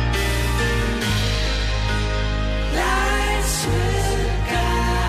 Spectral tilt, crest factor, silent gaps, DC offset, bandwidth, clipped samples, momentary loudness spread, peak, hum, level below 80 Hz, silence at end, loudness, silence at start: -4.5 dB/octave; 12 dB; none; under 0.1%; 15 kHz; under 0.1%; 3 LU; -8 dBFS; none; -24 dBFS; 0 s; -21 LUFS; 0 s